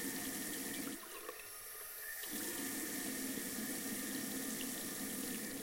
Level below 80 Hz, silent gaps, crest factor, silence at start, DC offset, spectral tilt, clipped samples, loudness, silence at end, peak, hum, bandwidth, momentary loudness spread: -72 dBFS; none; 16 dB; 0 s; under 0.1%; -2 dB/octave; under 0.1%; -42 LUFS; 0 s; -28 dBFS; none; 16.5 kHz; 6 LU